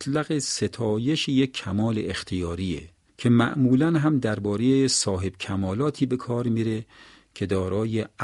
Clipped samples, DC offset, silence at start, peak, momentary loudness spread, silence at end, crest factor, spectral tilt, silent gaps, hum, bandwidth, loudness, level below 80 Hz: under 0.1%; under 0.1%; 0 s; -6 dBFS; 9 LU; 0 s; 18 dB; -5.5 dB/octave; none; none; 11.5 kHz; -24 LUFS; -52 dBFS